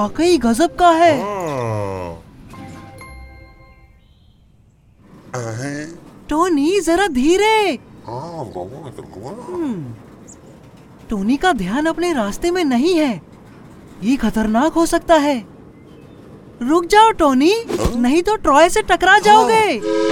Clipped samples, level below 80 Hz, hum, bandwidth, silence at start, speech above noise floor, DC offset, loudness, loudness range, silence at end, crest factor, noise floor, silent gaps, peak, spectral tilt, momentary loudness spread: under 0.1%; -38 dBFS; none; 17.5 kHz; 0 s; 35 dB; under 0.1%; -15 LUFS; 16 LU; 0 s; 18 dB; -51 dBFS; none; 0 dBFS; -4.5 dB/octave; 20 LU